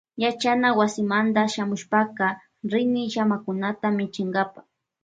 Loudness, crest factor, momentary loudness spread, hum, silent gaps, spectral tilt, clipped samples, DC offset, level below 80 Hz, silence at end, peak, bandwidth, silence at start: -24 LUFS; 18 dB; 6 LU; none; none; -5 dB/octave; under 0.1%; under 0.1%; -70 dBFS; 0.45 s; -6 dBFS; 9.2 kHz; 0.15 s